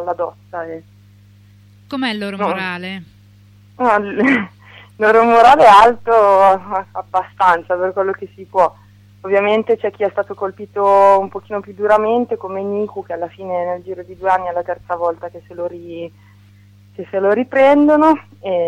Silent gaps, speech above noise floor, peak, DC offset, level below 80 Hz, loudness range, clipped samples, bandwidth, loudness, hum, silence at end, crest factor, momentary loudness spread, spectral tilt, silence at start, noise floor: none; 31 dB; 0 dBFS; under 0.1%; -54 dBFS; 11 LU; under 0.1%; 12.5 kHz; -15 LUFS; 50 Hz at -45 dBFS; 0 s; 16 dB; 18 LU; -5.5 dB/octave; 0 s; -45 dBFS